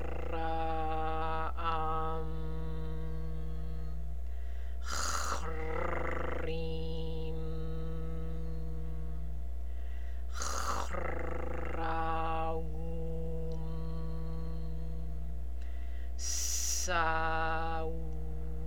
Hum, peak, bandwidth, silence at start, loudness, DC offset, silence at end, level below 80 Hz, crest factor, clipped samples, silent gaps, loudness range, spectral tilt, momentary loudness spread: none; -18 dBFS; 17 kHz; 0 s; -38 LUFS; 2%; 0 s; -40 dBFS; 20 dB; under 0.1%; none; 6 LU; -4 dB/octave; 10 LU